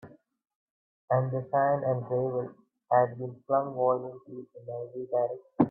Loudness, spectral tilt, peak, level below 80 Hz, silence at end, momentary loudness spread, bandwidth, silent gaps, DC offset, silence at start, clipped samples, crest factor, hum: -29 LUFS; -12.5 dB/octave; -8 dBFS; -72 dBFS; 0 s; 15 LU; 2.8 kHz; 0.56-1.08 s; under 0.1%; 0.05 s; under 0.1%; 22 dB; none